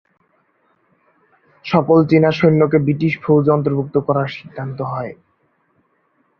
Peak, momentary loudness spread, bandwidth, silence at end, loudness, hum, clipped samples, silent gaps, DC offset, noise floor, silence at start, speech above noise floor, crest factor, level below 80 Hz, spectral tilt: -2 dBFS; 15 LU; 6.4 kHz; 1.25 s; -16 LUFS; none; under 0.1%; none; under 0.1%; -63 dBFS; 1.65 s; 47 dB; 16 dB; -56 dBFS; -9.5 dB/octave